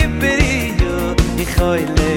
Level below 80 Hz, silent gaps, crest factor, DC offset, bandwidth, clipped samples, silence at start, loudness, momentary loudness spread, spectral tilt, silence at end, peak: -20 dBFS; none; 14 dB; under 0.1%; 17 kHz; under 0.1%; 0 s; -16 LUFS; 3 LU; -5.5 dB/octave; 0 s; 0 dBFS